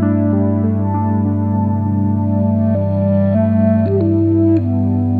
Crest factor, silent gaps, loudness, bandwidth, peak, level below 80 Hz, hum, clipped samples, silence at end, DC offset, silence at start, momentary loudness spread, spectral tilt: 12 dB; none; -15 LUFS; 2.7 kHz; -2 dBFS; -52 dBFS; 50 Hz at -20 dBFS; under 0.1%; 0 s; under 0.1%; 0 s; 3 LU; -13 dB/octave